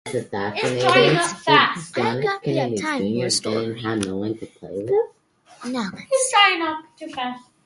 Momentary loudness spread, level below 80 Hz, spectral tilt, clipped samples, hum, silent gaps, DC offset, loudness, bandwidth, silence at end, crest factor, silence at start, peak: 15 LU; -60 dBFS; -3.5 dB/octave; under 0.1%; none; none; under 0.1%; -21 LUFS; 11.5 kHz; 0.25 s; 20 dB; 0.05 s; -2 dBFS